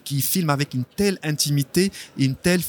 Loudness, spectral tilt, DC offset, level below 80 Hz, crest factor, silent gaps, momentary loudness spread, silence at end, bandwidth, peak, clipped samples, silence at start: -22 LUFS; -4.5 dB/octave; under 0.1%; -52 dBFS; 16 dB; none; 4 LU; 0 s; 19.5 kHz; -6 dBFS; under 0.1%; 0.05 s